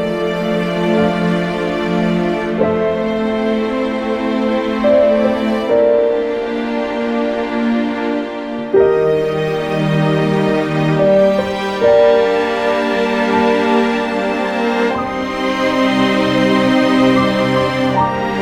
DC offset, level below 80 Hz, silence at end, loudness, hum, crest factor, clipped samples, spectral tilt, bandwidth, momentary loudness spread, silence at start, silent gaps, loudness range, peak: under 0.1%; -44 dBFS; 0 s; -15 LUFS; none; 14 dB; under 0.1%; -6.5 dB/octave; 14.5 kHz; 6 LU; 0 s; none; 3 LU; -2 dBFS